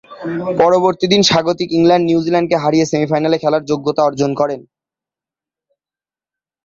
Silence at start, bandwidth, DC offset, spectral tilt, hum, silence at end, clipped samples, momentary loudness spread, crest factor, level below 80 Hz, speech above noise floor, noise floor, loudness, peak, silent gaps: 0.1 s; 7.8 kHz; under 0.1%; -5 dB/octave; none; 2.05 s; under 0.1%; 8 LU; 16 dB; -54 dBFS; over 76 dB; under -90 dBFS; -14 LUFS; 0 dBFS; none